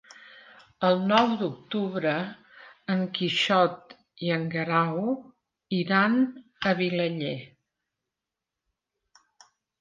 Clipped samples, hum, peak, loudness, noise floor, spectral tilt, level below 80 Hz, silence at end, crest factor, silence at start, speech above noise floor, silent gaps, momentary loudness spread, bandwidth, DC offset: under 0.1%; none; -8 dBFS; -26 LUFS; -88 dBFS; -6 dB/octave; -72 dBFS; 2.35 s; 20 dB; 0.35 s; 62 dB; none; 12 LU; 7.6 kHz; under 0.1%